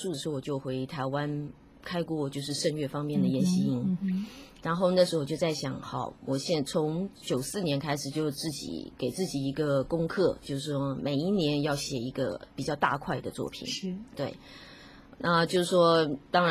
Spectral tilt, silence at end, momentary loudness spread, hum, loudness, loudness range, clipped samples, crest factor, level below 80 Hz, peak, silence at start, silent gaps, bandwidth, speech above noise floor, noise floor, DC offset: -5.5 dB/octave; 0 s; 11 LU; none; -30 LUFS; 3 LU; under 0.1%; 20 dB; -58 dBFS; -10 dBFS; 0 s; none; 15.5 kHz; 21 dB; -51 dBFS; under 0.1%